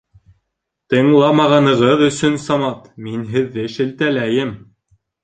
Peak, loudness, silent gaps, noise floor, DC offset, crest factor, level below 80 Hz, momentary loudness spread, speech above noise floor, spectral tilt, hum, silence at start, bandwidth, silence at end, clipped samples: -2 dBFS; -15 LUFS; none; -76 dBFS; under 0.1%; 16 dB; -54 dBFS; 12 LU; 61 dB; -6 dB/octave; none; 0.9 s; 9.2 kHz; 0.65 s; under 0.1%